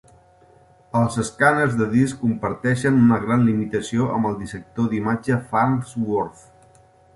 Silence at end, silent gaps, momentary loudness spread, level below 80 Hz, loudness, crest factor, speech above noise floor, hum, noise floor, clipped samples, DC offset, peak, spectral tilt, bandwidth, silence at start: 0.85 s; none; 8 LU; -52 dBFS; -21 LUFS; 18 dB; 33 dB; none; -53 dBFS; under 0.1%; under 0.1%; -4 dBFS; -7 dB/octave; 11.5 kHz; 0.95 s